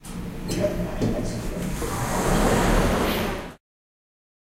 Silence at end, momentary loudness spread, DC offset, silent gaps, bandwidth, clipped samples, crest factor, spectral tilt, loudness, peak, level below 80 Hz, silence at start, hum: 1 s; 11 LU; under 0.1%; none; 16 kHz; under 0.1%; 18 dB; -5 dB/octave; -25 LUFS; -6 dBFS; -32 dBFS; 0 s; none